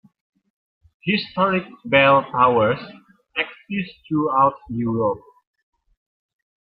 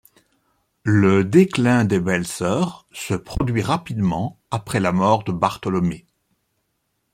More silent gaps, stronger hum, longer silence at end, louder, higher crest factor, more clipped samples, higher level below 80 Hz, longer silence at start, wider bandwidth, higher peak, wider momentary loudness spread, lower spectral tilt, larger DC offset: neither; neither; first, 1.4 s vs 1.15 s; about the same, -20 LUFS vs -20 LUFS; about the same, 20 dB vs 18 dB; neither; second, -58 dBFS vs -44 dBFS; first, 1.05 s vs 0.85 s; second, 5.4 kHz vs 15 kHz; about the same, -2 dBFS vs -2 dBFS; about the same, 12 LU vs 11 LU; first, -9.5 dB/octave vs -6.5 dB/octave; neither